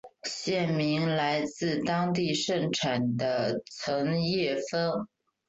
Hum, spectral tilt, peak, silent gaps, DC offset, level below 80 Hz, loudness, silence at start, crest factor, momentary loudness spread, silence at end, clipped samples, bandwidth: none; -5 dB/octave; -14 dBFS; none; under 0.1%; -66 dBFS; -29 LUFS; 0.05 s; 16 dB; 5 LU; 0.4 s; under 0.1%; 8.2 kHz